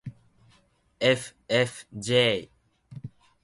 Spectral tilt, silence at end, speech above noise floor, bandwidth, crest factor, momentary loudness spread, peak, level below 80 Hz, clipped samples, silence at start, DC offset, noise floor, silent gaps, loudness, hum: -4 dB/octave; 0.35 s; 39 dB; 11.5 kHz; 20 dB; 22 LU; -10 dBFS; -62 dBFS; under 0.1%; 0.05 s; under 0.1%; -64 dBFS; none; -25 LUFS; none